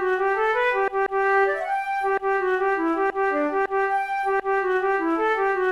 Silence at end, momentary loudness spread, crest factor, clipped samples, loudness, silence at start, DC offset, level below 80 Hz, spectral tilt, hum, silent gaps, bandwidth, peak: 0 s; 3 LU; 12 dB; under 0.1%; -22 LUFS; 0 s; 0.1%; -56 dBFS; -4.5 dB/octave; none; none; 11 kHz; -12 dBFS